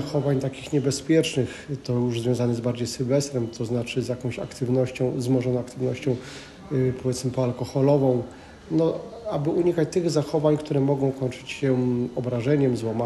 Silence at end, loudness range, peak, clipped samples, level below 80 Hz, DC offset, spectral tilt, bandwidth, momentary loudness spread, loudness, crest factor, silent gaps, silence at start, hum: 0 s; 2 LU; -8 dBFS; under 0.1%; -54 dBFS; under 0.1%; -6.5 dB/octave; 12.5 kHz; 8 LU; -25 LUFS; 16 dB; none; 0 s; none